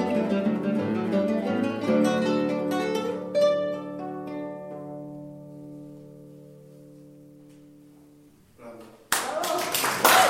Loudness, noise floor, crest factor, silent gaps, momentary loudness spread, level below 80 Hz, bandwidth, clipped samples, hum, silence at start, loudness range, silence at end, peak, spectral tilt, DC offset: -26 LUFS; -55 dBFS; 24 dB; none; 22 LU; -68 dBFS; 16.5 kHz; under 0.1%; none; 0 s; 22 LU; 0 s; -4 dBFS; -4 dB/octave; under 0.1%